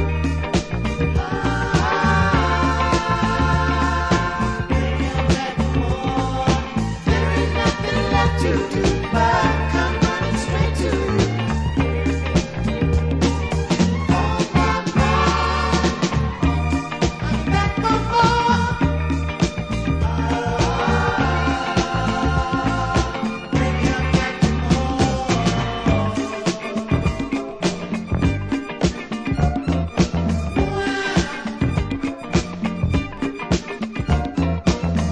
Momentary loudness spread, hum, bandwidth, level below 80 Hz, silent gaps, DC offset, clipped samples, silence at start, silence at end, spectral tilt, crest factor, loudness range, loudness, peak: 5 LU; none; 10.5 kHz; -28 dBFS; none; under 0.1%; under 0.1%; 0 s; 0 s; -6 dB/octave; 16 dB; 3 LU; -20 LUFS; -4 dBFS